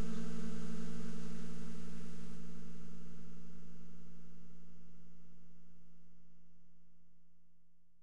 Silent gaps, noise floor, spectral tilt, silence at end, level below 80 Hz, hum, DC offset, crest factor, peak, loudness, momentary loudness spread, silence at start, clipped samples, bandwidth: none; -69 dBFS; -6.5 dB/octave; 0 s; -66 dBFS; none; 2%; 8 dB; -24 dBFS; -50 LUFS; 21 LU; 0 s; under 0.1%; 11 kHz